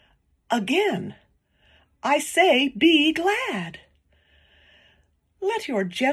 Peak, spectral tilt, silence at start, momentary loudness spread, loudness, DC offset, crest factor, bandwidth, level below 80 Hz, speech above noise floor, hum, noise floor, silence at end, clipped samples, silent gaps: -6 dBFS; -3.5 dB/octave; 0.5 s; 13 LU; -22 LUFS; under 0.1%; 18 dB; 14 kHz; -64 dBFS; 42 dB; none; -64 dBFS; 0 s; under 0.1%; none